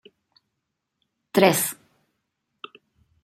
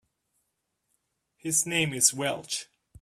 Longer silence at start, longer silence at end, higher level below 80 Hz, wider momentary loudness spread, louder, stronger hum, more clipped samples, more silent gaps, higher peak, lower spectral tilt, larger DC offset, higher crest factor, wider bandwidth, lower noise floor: about the same, 1.35 s vs 1.45 s; first, 1.5 s vs 0.4 s; about the same, -70 dBFS vs -68 dBFS; first, 25 LU vs 12 LU; first, -21 LUFS vs -26 LUFS; neither; neither; neither; first, -2 dBFS vs -6 dBFS; first, -4 dB/octave vs -2 dB/octave; neither; about the same, 26 dB vs 26 dB; about the same, 16 kHz vs 16 kHz; about the same, -80 dBFS vs -79 dBFS